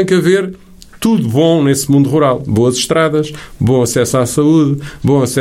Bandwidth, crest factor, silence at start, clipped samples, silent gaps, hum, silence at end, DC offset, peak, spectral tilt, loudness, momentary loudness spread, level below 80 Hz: 16.5 kHz; 12 dB; 0 s; under 0.1%; none; none; 0 s; under 0.1%; 0 dBFS; -5.5 dB/octave; -12 LUFS; 7 LU; -42 dBFS